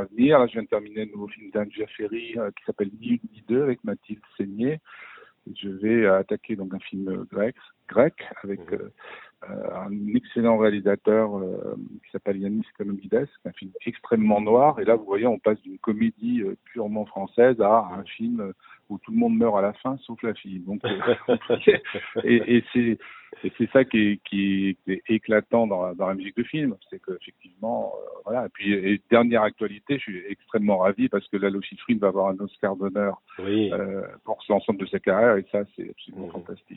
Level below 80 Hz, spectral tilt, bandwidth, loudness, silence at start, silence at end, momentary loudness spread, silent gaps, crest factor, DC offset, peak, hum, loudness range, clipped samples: -64 dBFS; -10.5 dB/octave; 4.1 kHz; -24 LUFS; 0 s; 0 s; 15 LU; none; 22 dB; under 0.1%; -2 dBFS; none; 6 LU; under 0.1%